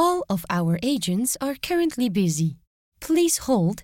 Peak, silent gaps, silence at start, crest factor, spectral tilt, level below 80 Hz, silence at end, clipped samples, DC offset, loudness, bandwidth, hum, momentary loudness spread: -8 dBFS; 2.67-2.92 s; 0 s; 14 dB; -5 dB/octave; -54 dBFS; 0 s; under 0.1%; under 0.1%; -23 LUFS; 17 kHz; none; 6 LU